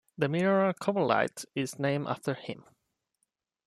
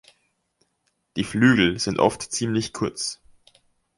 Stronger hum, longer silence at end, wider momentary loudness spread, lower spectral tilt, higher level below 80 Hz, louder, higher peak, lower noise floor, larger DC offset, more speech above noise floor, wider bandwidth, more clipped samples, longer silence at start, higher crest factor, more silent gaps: neither; first, 1.05 s vs 0.85 s; about the same, 11 LU vs 13 LU; first, -6 dB/octave vs -4.5 dB/octave; second, -74 dBFS vs -52 dBFS; second, -30 LUFS vs -22 LUFS; second, -10 dBFS vs -2 dBFS; first, -81 dBFS vs -72 dBFS; neither; about the same, 52 dB vs 51 dB; first, 13.5 kHz vs 11.5 kHz; neither; second, 0.2 s vs 1.15 s; about the same, 22 dB vs 22 dB; neither